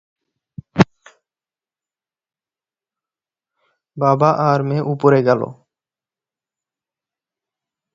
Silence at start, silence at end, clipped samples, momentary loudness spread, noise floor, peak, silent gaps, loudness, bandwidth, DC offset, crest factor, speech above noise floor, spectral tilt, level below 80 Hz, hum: 0.75 s; 2.4 s; under 0.1%; 6 LU; under -90 dBFS; 0 dBFS; none; -17 LUFS; 7.4 kHz; under 0.1%; 22 dB; over 75 dB; -8 dB/octave; -56 dBFS; none